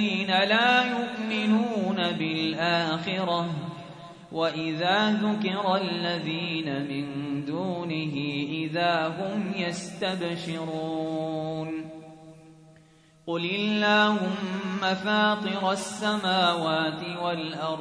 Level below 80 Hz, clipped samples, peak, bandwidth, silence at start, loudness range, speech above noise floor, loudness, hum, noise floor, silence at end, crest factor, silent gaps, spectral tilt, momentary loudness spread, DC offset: -70 dBFS; under 0.1%; -10 dBFS; 10.5 kHz; 0 s; 7 LU; 30 dB; -26 LUFS; none; -57 dBFS; 0 s; 18 dB; none; -5 dB/octave; 10 LU; under 0.1%